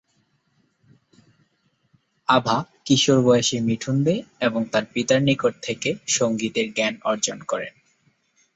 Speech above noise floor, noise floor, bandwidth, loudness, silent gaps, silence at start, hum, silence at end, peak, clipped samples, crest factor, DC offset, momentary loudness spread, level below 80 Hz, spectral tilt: 46 dB; -68 dBFS; 8.2 kHz; -22 LUFS; none; 2.3 s; none; 0.85 s; -4 dBFS; under 0.1%; 20 dB; under 0.1%; 9 LU; -62 dBFS; -4 dB/octave